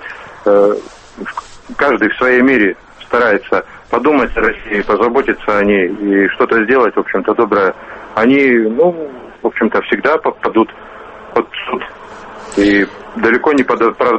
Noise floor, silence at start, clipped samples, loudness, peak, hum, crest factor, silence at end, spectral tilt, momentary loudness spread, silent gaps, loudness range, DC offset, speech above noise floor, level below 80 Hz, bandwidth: -32 dBFS; 0 s; under 0.1%; -13 LUFS; 0 dBFS; none; 14 dB; 0 s; -6 dB/octave; 15 LU; none; 4 LU; under 0.1%; 20 dB; -40 dBFS; 8.4 kHz